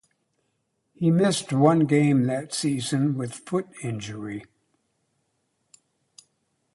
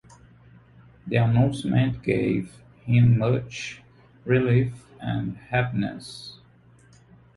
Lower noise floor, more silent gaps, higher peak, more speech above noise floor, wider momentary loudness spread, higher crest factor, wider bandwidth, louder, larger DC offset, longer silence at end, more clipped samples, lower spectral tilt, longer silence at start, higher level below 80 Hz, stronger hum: first, -74 dBFS vs -54 dBFS; neither; about the same, -6 dBFS vs -8 dBFS; first, 51 dB vs 32 dB; second, 14 LU vs 20 LU; about the same, 20 dB vs 18 dB; about the same, 11.5 kHz vs 11.5 kHz; about the same, -24 LUFS vs -24 LUFS; neither; first, 2.3 s vs 1.05 s; neither; second, -6 dB/octave vs -7.5 dB/octave; about the same, 1 s vs 1.05 s; second, -66 dBFS vs -52 dBFS; neither